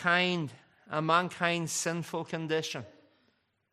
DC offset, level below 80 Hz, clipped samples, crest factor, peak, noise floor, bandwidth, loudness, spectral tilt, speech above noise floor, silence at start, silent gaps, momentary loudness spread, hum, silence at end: under 0.1%; -76 dBFS; under 0.1%; 22 dB; -10 dBFS; -73 dBFS; 14.5 kHz; -31 LUFS; -3.5 dB/octave; 43 dB; 0 s; none; 11 LU; none; 0.85 s